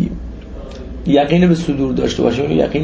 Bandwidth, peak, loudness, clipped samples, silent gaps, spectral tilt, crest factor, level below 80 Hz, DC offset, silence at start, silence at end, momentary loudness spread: 8 kHz; 0 dBFS; -15 LUFS; under 0.1%; none; -7 dB/octave; 16 dB; -32 dBFS; under 0.1%; 0 s; 0 s; 19 LU